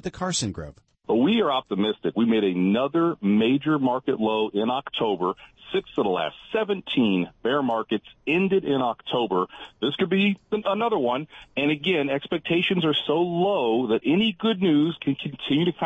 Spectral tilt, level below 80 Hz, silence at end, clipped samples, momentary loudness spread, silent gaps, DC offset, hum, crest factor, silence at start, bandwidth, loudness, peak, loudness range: -5.5 dB/octave; -60 dBFS; 0 s; under 0.1%; 7 LU; none; under 0.1%; none; 12 dB; 0.05 s; 8.6 kHz; -24 LUFS; -12 dBFS; 3 LU